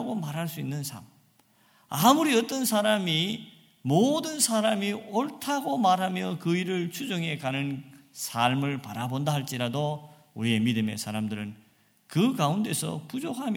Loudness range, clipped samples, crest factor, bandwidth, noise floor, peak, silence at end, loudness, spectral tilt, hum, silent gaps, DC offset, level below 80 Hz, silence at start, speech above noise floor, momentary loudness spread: 5 LU; under 0.1%; 22 dB; 18 kHz; -63 dBFS; -6 dBFS; 0 s; -27 LUFS; -4.5 dB/octave; none; none; under 0.1%; -72 dBFS; 0 s; 36 dB; 11 LU